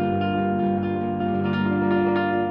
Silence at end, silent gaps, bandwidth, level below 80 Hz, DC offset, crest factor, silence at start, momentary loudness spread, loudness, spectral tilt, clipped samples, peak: 0 s; none; 5.2 kHz; -56 dBFS; under 0.1%; 12 dB; 0 s; 3 LU; -23 LUFS; -10 dB/octave; under 0.1%; -10 dBFS